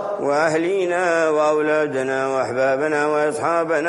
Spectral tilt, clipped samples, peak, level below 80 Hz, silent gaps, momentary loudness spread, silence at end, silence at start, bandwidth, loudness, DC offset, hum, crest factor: -5 dB/octave; under 0.1%; -6 dBFS; -64 dBFS; none; 3 LU; 0 s; 0 s; 11.5 kHz; -19 LUFS; under 0.1%; none; 14 dB